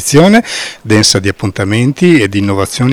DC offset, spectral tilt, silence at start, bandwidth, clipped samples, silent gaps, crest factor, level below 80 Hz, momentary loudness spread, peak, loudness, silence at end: under 0.1%; -4.5 dB/octave; 0 s; over 20 kHz; 2%; none; 10 dB; -40 dBFS; 9 LU; 0 dBFS; -10 LUFS; 0 s